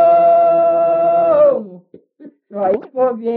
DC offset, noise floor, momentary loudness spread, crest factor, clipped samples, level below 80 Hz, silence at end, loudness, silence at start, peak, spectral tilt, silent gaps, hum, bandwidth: under 0.1%; -42 dBFS; 10 LU; 10 dB; under 0.1%; -60 dBFS; 0 s; -14 LUFS; 0 s; -4 dBFS; -6 dB/octave; none; none; 4 kHz